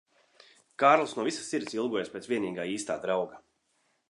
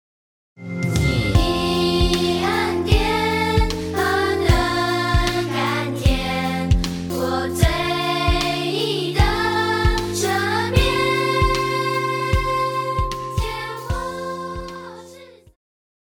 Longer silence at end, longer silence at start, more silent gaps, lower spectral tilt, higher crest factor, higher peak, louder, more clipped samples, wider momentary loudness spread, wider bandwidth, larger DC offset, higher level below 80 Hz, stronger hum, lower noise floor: about the same, 0.7 s vs 0.8 s; first, 0.8 s vs 0.6 s; neither; about the same, -4 dB/octave vs -5 dB/octave; first, 24 dB vs 18 dB; second, -8 dBFS vs -2 dBFS; second, -29 LUFS vs -20 LUFS; neither; first, 11 LU vs 8 LU; second, 11.5 kHz vs 19 kHz; neither; second, -76 dBFS vs -28 dBFS; neither; first, -74 dBFS vs -44 dBFS